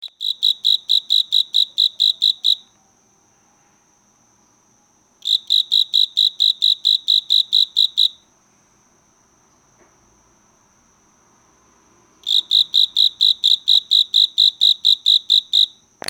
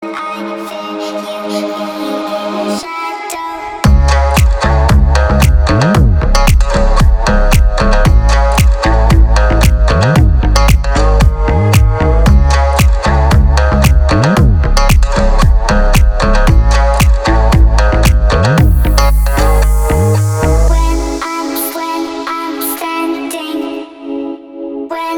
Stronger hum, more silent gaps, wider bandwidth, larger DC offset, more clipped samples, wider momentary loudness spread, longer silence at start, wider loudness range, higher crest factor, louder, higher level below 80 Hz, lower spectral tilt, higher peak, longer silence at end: neither; neither; second, 17 kHz vs 19 kHz; neither; second, under 0.1% vs 0.3%; second, 6 LU vs 10 LU; about the same, 0 s vs 0 s; first, 10 LU vs 7 LU; first, 16 dB vs 10 dB; about the same, -14 LUFS vs -12 LUFS; second, -72 dBFS vs -10 dBFS; second, 2.5 dB/octave vs -6 dB/octave; about the same, -2 dBFS vs 0 dBFS; first, 0.4 s vs 0 s